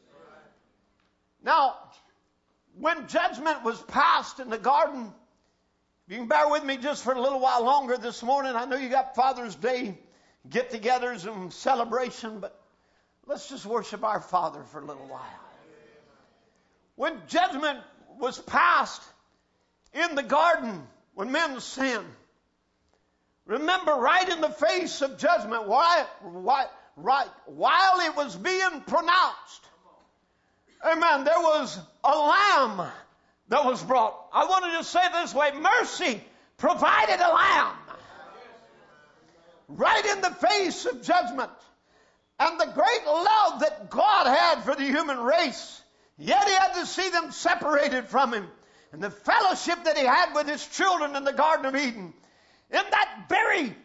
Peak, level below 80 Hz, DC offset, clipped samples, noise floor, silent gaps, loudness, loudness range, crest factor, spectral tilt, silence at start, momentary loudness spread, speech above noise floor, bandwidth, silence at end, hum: -8 dBFS; -66 dBFS; under 0.1%; under 0.1%; -72 dBFS; none; -25 LUFS; 7 LU; 20 dB; -2.5 dB/octave; 1.45 s; 15 LU; 47 dB; 8 kHz; 0.1 s; none